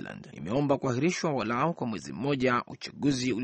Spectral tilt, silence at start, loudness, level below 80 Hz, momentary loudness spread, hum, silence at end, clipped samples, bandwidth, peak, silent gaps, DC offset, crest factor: -5.5 dB/octave; 0 s; -29 LUFS; -62 dBFS; 8 LU; none; 0 s; under 0.1%; 8.4 kHz; -12 dBFS; none; under 0.1%; 18 dB